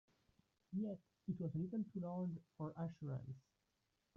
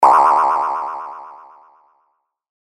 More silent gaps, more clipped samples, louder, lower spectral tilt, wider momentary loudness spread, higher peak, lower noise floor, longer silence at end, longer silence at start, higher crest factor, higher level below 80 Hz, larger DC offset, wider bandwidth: neither; neither; second, -47 LUFS vs -15 LUFS; first, -11 dB/octave vs -3 dB/octave; second, 7 LU vs 24 LU; second, -34 dBFS vs 0 dBFS; first, -86 dBFS vs -67 dBFS; second, 0.75 s vs 1.25 s; first, 0.7 s vs 0 s; about the same, 14 dB vs 18 dB; about the same, -78 dBFS vs -78 dBFS; neither; second, 6.2 kHz vs 13 kHz